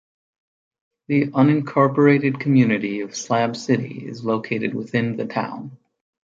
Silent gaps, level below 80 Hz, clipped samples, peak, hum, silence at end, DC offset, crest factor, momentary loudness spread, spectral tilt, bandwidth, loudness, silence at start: none; -64 dBFS; under 0.1%; -4 dBFS; none; 0.65 s; under 0.1%; 18 dB; 12 LU; -6.5 dB/octave; 7.6 kHz; -20 LUFS; 1.1 s